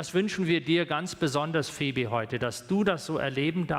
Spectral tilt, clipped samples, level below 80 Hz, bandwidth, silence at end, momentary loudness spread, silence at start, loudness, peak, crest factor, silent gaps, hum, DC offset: -5.5 dB/octave; under 0.1%; -60 dBFS; 15.5 kHz; 0 s; 4 LU; 0 s; -28 LUFS; -14 dBFS; 14 dB; none; none; under 0.1%